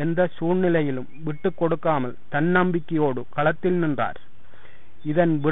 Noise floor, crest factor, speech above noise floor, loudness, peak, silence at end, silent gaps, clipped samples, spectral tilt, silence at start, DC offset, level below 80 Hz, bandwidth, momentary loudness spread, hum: -52 dBFS; 16 dB; 29 dB; -23 LUFS; -8 dBFS; 0 s; none; under 0.1%; -12 dB/octave; 0 s; 3%; -56 dBFS; 4 kHz; 7 LU; none